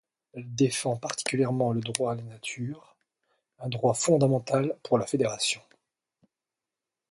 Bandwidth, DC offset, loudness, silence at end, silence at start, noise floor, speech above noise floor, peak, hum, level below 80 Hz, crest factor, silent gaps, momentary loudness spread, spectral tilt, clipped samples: 11.5 kHz; under 0.1%; -28 LUFS; 1.5 s; 0.35 s; -89 dBFS; 62 dB; -4 dBFS; none; -68 dBFS; 24 dB; none; 14 LU; -5 dB/octave; under 0.1%